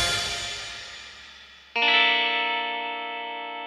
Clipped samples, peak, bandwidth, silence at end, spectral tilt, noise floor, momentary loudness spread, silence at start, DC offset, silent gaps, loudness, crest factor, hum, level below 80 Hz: under 0.1%; -8 dBFS; 15.5 kHz; 0 s; -0.5 dB/octave; -48 dBFS; 22 LU; 0 s; under 0.1%; none; -23 LUFS; 20 dB; none; -54 dBFS